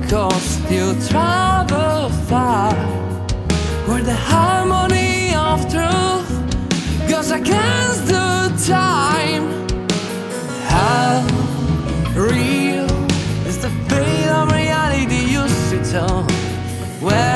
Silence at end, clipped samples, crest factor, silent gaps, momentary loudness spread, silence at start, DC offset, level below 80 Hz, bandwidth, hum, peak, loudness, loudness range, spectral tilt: 0 s; under 0.1%; 16 dB; none; 6 LU; 0 s; under 0.1%; -30 dBFS; 12 kHz; none; 0 dBFS; -17 LUFS; 1 LU; -5 dB/octave